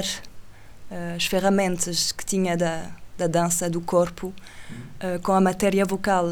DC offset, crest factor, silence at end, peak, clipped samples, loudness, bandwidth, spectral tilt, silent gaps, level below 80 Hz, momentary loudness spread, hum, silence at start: under 0.1%; 16 dB; 0 s; -8 dBFS; under 0.1%; -23 LUFS; over 20 kHz; -4 dB/octave; none; -48 dBFS; 17 LU; none; 0 s